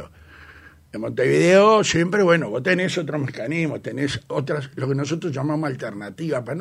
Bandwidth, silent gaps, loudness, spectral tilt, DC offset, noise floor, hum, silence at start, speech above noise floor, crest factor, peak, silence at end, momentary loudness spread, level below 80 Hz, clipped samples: 13.5 kHz; none; -21 LUFS; -5.5 dB/octave; under 0.1%; -46 dBFS; none; 0 s; 26 dB; 18 dB; -4 dBFS; 0 s; 13 LU; -56 dBFS; under 0.1%